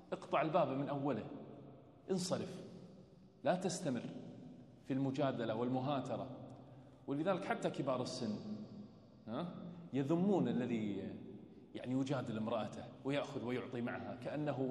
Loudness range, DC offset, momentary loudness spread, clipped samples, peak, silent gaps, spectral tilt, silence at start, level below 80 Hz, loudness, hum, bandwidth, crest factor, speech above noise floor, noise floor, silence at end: 3 LU; under 0.1%; 19 LU; under 0.1%; -20 dBFS; none; -6.5 dB/octave; 0 s; -78 dBFS; -40 LUFS; none; 11.5 kHz; 20 dB; 22 dB; -61 dBFS; 0 s